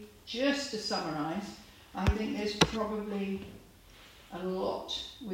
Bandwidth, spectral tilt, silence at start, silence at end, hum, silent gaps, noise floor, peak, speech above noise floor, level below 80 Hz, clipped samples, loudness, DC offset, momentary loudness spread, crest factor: 16 kHz; -4.5 dB/octave; 0 s; 0 s; none; none; -55 dBFS; -6 dBFS; 22 dB; -46 dBFS; under 0.1%; -33 LUFS; under 0.1%; 19 LU; 28 dB